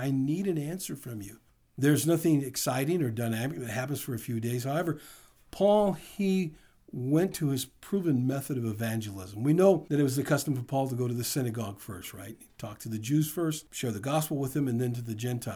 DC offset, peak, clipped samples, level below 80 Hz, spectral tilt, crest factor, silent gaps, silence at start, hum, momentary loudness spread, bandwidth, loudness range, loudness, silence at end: under 0.1%; -10 dBFS; under 0.1%; -64 dBFS; -6 dB/octave; 20 dB; none; 0 s; none; 15 LU; over 20 kHz; 4 LU; -30 LUFS; 0 s